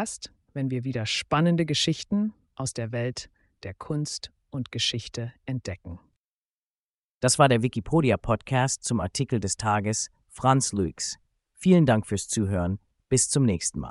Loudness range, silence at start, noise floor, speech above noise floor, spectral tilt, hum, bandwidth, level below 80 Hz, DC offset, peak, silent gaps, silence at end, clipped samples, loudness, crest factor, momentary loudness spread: 8 LU; 0 s; under -90 dBFS; over 65 dB; -4.5 dB/octave; none; 11.5 kHz; -50 dBFS; under 0.1%; -6 dBFS; 6.16-7.21 s; 0 s; under 0.1%; -26 LUFS; 20 dB; 16 LU